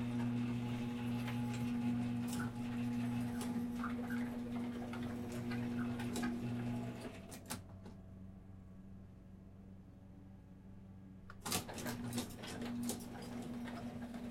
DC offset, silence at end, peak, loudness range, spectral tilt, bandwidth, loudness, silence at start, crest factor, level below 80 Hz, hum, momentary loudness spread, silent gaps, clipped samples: under 0.1%; 0 s; -22 dBFS; 14 LU; -5.5 dB/octave; 16.5 kHz; -42 LUFS; 0 s; 20 dB; -62 dBFS; none; 18 LU; none; under 0.1%